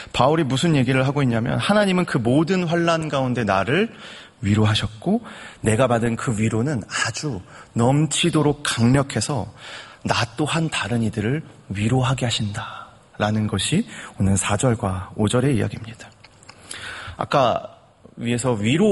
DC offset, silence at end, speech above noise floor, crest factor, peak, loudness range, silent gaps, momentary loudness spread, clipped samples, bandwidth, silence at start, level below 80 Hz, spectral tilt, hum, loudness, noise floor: under 0.1%; 0 s; 26 dB; 20 dB; -2 dBFS; 4 LU; none; 14 LU; under 0.1%; 11.5 kHz; 0 s; -48 dBFS; -5.5 dB/octave; none; -21 LUFS; -47 dBFS